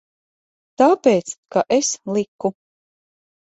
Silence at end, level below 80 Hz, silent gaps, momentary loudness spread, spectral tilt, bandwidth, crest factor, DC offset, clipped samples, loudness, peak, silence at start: 1 s; -68 dBFS; 1.38-1.43 s, 2.28-2.39 s; 10 LU; -4 dB/octave; 8.2 kHz; 18 dB; under 0.1%; under 0.1%; -19 LUFS; -2 dBFS; 0.8 s